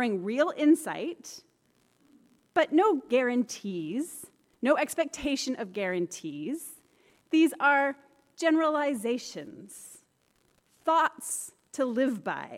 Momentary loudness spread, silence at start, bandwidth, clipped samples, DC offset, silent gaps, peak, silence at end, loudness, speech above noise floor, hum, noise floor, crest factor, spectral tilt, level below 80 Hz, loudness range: 19 LU; 0 s; 15.5 kHz; under 0.1%; under 0.1%; none; -12 dBFS; 0 s; -28 LUFS; 42 dB; none; -70 dBFS; 18 dB; -4 dB/octave; -68 dBFS; 4 LU